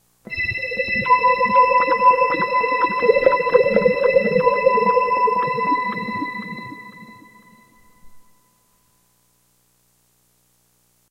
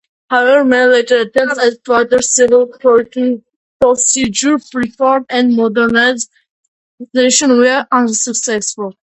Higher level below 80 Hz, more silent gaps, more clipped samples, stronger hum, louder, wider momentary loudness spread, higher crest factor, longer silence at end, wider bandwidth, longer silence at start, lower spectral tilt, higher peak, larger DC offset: about the same, -54 dBFS vs -54 dBFS; second, none vs 3.56-3.80 s, 6.49-6.98 s; neither; first, 60 Hz at -55 dBFS vs none; second, -17 LUFS vs -12 LUFS; first, 13 LU vs 8 LU; first, 18 dB vs 12 dB; first, 2.9 s vs 0.25 s; about the same, 9.4 kHz vs 8.8 kHz; about the same, 0.3 s vs 0.3 s; first, -6.5 dB/octave vs -2 dB/octave; about the same, -2 dBFS vs 0 dBFS; neither